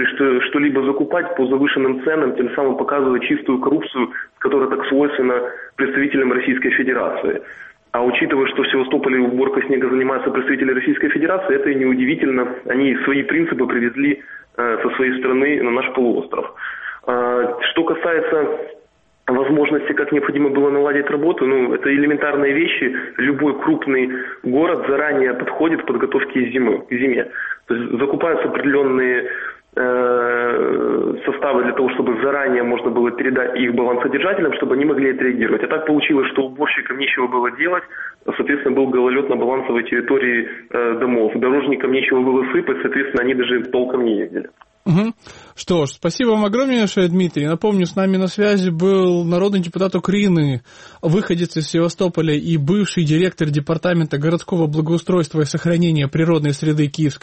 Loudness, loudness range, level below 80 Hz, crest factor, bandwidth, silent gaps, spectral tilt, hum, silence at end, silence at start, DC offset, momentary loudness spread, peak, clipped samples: -18 LUFS; 2 LU; -56 dBFS; 14 dB; 8.4 kHz; none; -6.5 dB/octave; none; 0.05 s; 0 s; under 0.1%; 5 LU; -4 dBFS; under 0.1%